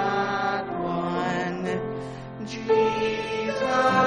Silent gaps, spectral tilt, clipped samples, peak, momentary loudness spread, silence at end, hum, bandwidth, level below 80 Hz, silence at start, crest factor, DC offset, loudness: none; -5.5 dB/octave; under 0.1%; -8 dBFS; 12 LU; 0 s; none; 10 kHz; -56 dBFS; 0 s; 16 dB; under 0.1%; -26 LUFS